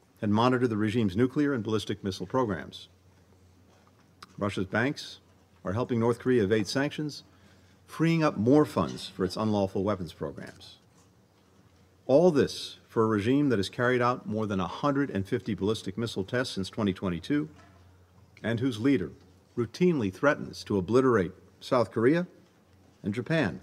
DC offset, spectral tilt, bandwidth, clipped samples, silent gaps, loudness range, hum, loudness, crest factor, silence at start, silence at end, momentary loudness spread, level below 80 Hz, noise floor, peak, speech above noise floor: under 0.1%; -6.5 dB/octave; 14 kHz; under 0.1%; none; 6 LU; none; -28 LUFS; 20 dB; 0.2 s; 0.05 s; 13 LU; -64 dBFS; -62 dBFS; -8 dBFS; 34 dB